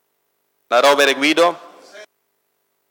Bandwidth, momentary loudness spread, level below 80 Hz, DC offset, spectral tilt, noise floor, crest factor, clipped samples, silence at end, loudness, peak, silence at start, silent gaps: 19 kHz; 6 LU; -82 dBFS; under 0.1%; -1.5 dB/octave; -69 dBFS; 18 dB; under 0.1%; 0.85 s; -15 LUFS; 0 dBFS; 0.7 s; none